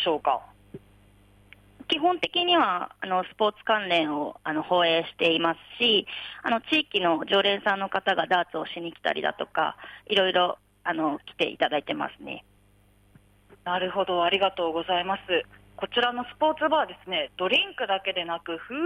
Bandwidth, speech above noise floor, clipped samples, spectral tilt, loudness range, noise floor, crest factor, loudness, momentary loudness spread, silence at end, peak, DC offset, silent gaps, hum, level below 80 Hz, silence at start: 12.5 kHz; 34 dB; under 0.1%; -5 dB/octave; 4 LU; -60 dBFS; 18 dB; -26 LUFS; 10 LU; 0 s; -10 dBFS; under 0.1%; none; none; -64 dBFS; 0 s